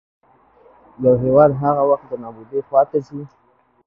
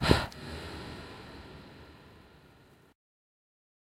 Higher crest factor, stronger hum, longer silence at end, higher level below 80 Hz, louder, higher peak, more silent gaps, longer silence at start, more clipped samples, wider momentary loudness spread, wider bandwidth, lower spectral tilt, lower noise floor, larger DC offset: second, 18 dB vs 32 dB; neither; second, 0.6 s vs 1.35 s; second, -52 dBFS vs -46 dBFS; first, -17 LUFS vs -36 LUFS; first, 0 dBFS vs -4 dBFS; neither; first, 1 s vs 0 s; neither; second, 18 LU vs 26 LU; second, 5.6 kHz vs 16 kHz; first, -11.5 dB/octave vs -5.5 dB/octave; second, -52 dBFS vs -59 dBFS; neither